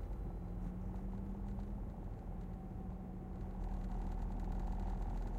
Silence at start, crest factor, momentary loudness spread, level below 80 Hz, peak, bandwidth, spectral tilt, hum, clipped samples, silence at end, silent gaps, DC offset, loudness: 0 s; 12 dB; 5 LU; -44 dBFS; -30 dBFS; 7.2 kHz; -9 dB/octave; none; under 0.1%; 0 s; none; under 0.1%; -46 LUFS